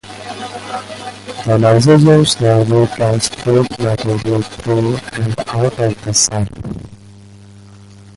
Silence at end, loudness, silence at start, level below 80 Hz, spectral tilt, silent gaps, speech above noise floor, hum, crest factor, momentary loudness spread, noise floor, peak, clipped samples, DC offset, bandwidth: 0.4 s; -14 LUFS; 0.05 s; -42 dBFS; -5 dB/octave; none; 25 dB; none; 14 dB; 18 LU; -38 dBFS; 0 dBFS; under 0.1%; under 0.1%; 11.5 kHz